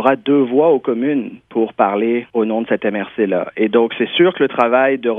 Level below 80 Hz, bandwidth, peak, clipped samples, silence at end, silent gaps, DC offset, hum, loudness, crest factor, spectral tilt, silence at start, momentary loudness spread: -64 dBFS; 3.8 kHz; 0 dBFS; under 0.1%; 0 s; none; under 0.1%; none; -16 LUFS; 16 dB; -8 dB/octave; 0 s; 6 LU